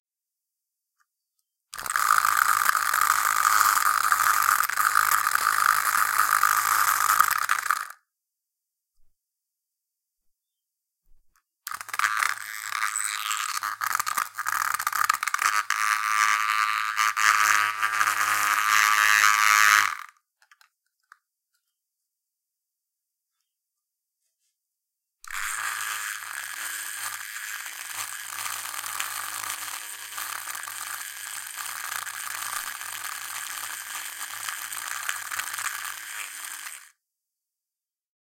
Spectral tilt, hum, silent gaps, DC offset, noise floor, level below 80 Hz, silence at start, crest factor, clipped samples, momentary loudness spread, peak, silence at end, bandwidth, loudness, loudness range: 2.5 dB/octave; none; none; under 0.1%; under -90 dBFS; -72 dBFS; 1.75 s; 26 dB; under 0.1%; 14 LU; -2 dBFS; 1.45 s; 17 kHz; -24 LUFS; 12 LU